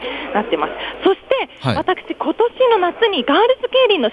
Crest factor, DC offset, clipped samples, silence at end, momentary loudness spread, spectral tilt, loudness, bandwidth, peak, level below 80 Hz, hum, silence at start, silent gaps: 16 dB; under 0.1%; under 0.1%; 0 s; 7 LU; -6.5 dB/octave; -17 LUFS; 10.5 kHz; -2 dBFS; -50 dBFS; none; 0 s; none